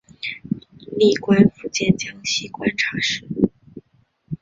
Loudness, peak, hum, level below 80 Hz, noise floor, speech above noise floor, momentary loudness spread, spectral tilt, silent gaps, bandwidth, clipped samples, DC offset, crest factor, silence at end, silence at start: -20 LUFS; -2 dBFS; none; -52 dBFS; -61 dBFS; 42 dB; 14 LU; -5 dB/octave; none; 7.8 kHz; under 0.1%; under 0.1%; 20 dB; 0.05 s; 0.25 s